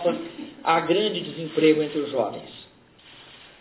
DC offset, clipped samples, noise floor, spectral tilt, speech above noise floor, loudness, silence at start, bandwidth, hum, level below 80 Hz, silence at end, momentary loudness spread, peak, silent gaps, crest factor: under 0.1%; under 0.1%; -52 dBFS; -9.5 dB/octave; 29 dB; -24 LUFS; 0 s; 4 kHz; none; -68 dBFS; 0.25 s; 20 LU; -6 dBFS; none; 18 dB